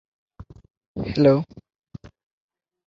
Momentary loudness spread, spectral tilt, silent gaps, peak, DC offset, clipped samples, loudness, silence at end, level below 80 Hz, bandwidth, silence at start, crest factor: 27 LU; -9 dB/octave; 0.77-0.95 s; -4 dBFS; under 0.1%; under 0.1%; -21 LUFS; 1.45 s; -50 dBFS; 7.2 kHz; 0.4 s; 22 dB